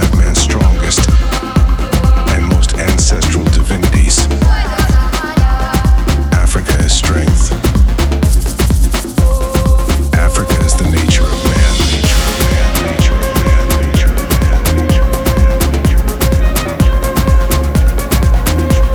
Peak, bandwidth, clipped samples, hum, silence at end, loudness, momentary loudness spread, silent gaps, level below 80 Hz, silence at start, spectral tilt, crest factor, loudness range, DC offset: 0 dBFS; over 20 kHz; under 0.1%; none; 0 s; -12 LUFS; 2 LU; none; -12 dBFS; 0 s; -5 dB/octave; 10 dB; 1 LU; under 0.1%